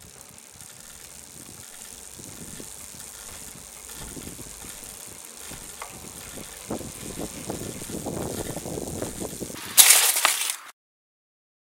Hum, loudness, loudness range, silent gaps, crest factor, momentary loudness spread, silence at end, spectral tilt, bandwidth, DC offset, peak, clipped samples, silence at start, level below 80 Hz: none; -22 LUFS; 18 LU; none; 30 dB; 22 LU; 0.9 s; -0.5 dB/octave; 17 kHz; under 0.1%; 0 dBFS; under 0.1%; 0 s; -52 dBFS